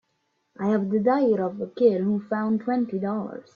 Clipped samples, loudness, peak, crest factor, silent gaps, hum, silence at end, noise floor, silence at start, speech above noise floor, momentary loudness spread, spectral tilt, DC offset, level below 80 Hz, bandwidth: under 0.1%; -24 LUFS; -8 dBFS; 16 dB; none; none; 0.15 s; -73 dBFS; 0.6 s; 50 dB; 8 LU; -9.5 dB/octave; under 0.1%; -68 dBFS; 6.4 kHz